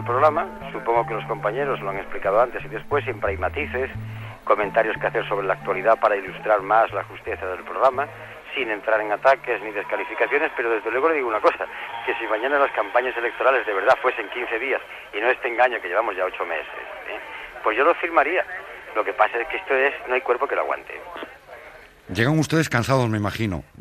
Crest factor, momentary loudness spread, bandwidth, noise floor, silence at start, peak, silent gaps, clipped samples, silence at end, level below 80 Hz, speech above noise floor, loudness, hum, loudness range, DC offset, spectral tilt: 20 dB; 12 LU; 13.5 kHz; -45 dBFS; 0 s; -4 dBFS; none; under 0.1%; 0 s; -50 dBFS; 22 dB; -22 LUFS; none; 3 LU; under 0.1%; -5.5 dB/octave